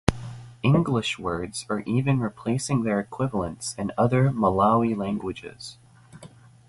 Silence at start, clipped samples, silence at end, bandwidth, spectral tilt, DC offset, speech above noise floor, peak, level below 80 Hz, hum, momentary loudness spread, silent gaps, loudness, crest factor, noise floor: 0.1 s; under 0.1%; 0.4 s; 11.5 kHz; -6 dB/octave; under 0.1%; 24 dB; 0 dBFS; -46 dBFS; none; 14 LU; none; -25 LUFS; 24 dB; -48 dBFS